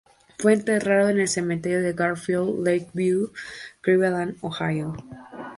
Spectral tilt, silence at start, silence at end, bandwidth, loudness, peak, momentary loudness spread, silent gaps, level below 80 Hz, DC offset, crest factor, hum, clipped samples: -5.5 dB/octave; 0.4 s; 0 s; 11.5 kHz; -23 LUFS; -6 dBFS; 14 LU; none; -60 dBFS; under 0.1%; 18 dB; none; under 0.1%